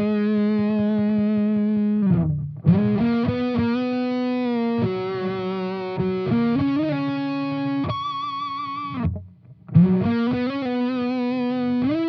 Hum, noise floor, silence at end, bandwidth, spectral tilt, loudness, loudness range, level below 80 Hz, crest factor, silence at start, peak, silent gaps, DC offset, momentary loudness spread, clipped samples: none; -44 dBFS; 0 s; 6 kHz; -9.5 dB/octave; -22 LUFS; 3 LU; -52 dBFS; 18 dB; 0 s; -4 dBFS; none; under 0.1%; 7 LU; under 0.1%